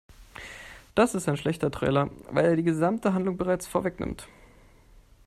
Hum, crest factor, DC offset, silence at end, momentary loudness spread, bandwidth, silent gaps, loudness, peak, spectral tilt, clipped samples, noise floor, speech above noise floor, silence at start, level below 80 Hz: none; 20 dB; under 0.1%; 1 s; 18 LU; 14 kHz; none; -27 LUFS; -8 dBFS; -6.5 dB/octave; under 0.1%; -55 dBFS; 29 dB; 0.2 s; -52 dBFS